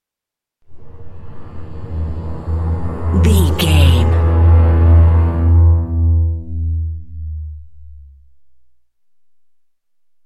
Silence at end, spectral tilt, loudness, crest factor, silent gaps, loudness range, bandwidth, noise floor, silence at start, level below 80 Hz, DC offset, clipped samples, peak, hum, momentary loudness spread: 2.25 s; -7 dB/octave; -14 LUFS; 14 dB; none; 14 LU; 13 kHz; -85 dBFS; 0.7 s; -24 dBFS; under 0.1%; under 0.1%; 0 dBFS; none; 18 LU